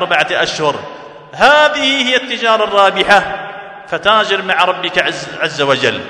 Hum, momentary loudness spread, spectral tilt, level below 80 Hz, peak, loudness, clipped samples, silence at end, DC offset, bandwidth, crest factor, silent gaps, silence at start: none; 15 LU; -3 dB/octave; -50 dBFS; 0 dBFS; -12 LUFS; 0.3%; 0 s; under 0.1%; 12 kHz; 14 dB; none; 0 s